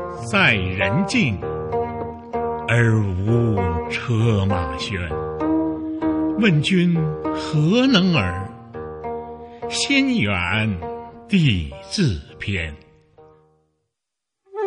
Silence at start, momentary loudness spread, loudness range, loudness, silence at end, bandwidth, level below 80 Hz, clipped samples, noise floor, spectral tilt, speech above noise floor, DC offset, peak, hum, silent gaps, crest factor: 0 s; 14 LU; 4 LU; -20 LUFS; 0 s; 10.5 kHz; -42 dBFS; under 0.1%; -83 dBFS; -6 dB/octave; 64 dB; under 0.1%; -2 dBFS; none; none; 18 dB